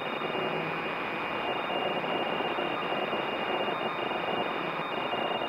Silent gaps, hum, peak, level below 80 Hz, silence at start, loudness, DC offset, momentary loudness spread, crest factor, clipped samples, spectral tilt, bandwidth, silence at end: none; none; -18 dBFS; -68 dBFS; 0 s; -31 LUFS; under 0.1%; 2 LU; 14 dB; under 0.1%; -5.5 dB/octave; 16 kHz; 0 s